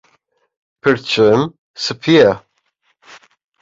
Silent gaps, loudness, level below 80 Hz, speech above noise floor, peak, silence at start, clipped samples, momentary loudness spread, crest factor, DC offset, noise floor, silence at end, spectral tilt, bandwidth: 1.58-1.74 s; -14 LUFS; -54 dBFS; 51 dB; 0 dBFS; 0.85 s; under 0.1%; 12 LU; 16 dB; under 0.1%; -64 dBFS; 1.25 s; -5.5 dB/octave; 7.8 kHz